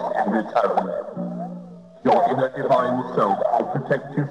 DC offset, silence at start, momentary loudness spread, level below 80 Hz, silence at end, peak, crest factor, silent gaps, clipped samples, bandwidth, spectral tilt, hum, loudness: under 0.1%; 0 s; 12 LU; -64 dBFS; 0 s; -6 dBFS; 16 dB; none; under 0.1%; 11 kHz; -8 dB/octave; none; -22 LUFS